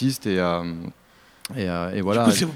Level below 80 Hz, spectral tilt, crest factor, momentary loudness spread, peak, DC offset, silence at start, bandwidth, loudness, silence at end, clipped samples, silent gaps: -54 dBFS; -5 dB/octave; 18 dB; 17 LU; -6 dBFS; under 0.1%; 0 s; 16.5 kHz; -23 LUFS; 0 s; under 0.1%; none